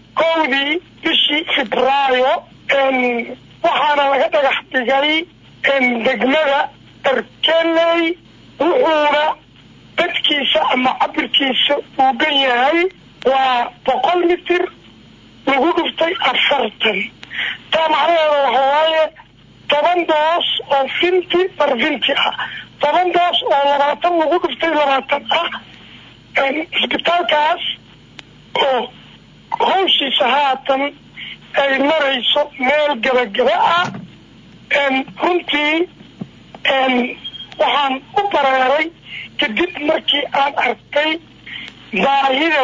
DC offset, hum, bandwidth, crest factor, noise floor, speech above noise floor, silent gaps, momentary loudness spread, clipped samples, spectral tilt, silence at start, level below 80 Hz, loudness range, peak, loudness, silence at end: under 0.1%; none; 7.6 kHz; 12 dB; -44 dBFS; 28 dB; none; 9 LU; under 0.1%; -4 dB/octave; 0.15 s; -56 dBFS; 2 LU; -4 dBFS; -16 LUFS; 0 s